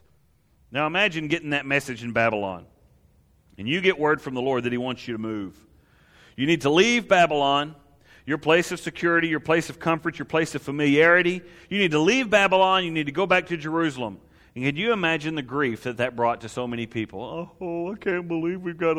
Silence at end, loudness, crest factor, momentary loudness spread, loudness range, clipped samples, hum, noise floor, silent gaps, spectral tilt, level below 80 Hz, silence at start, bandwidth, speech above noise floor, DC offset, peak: 0 s; -23 LUFS; 20 dB; 13 LU; 6 LU; under 0.1%; none; -62 dBFS; none; -5 dB/octave; -58 dBFS; 0.7 s; 15 kHz; 39 dB; under 0.1%; -4 dBFS